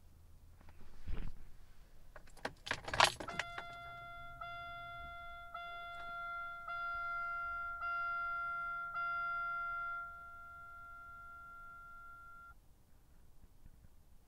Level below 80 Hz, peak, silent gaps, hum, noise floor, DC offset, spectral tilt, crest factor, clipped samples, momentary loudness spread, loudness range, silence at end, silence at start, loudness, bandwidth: -56 dBFS; -12 dBFS; none; none; -63 dBFS; under 0.1%; -2 dB/octave; 32 dB; under 0.1%; 16 LU; 14 LU; 0 s; 0 s; -41 LUFS; 16 kHz